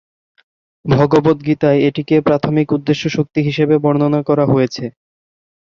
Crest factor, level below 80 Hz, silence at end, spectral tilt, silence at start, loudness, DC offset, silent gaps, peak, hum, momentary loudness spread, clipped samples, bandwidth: 14 dB; -50 dBFS; 0.9 s; -7.5 dB/octave; 0.85 s; -15 LUFS; under 0.1%; none; -2 dBFS; none; 5 LU; under 0.1%; 7.2 kHz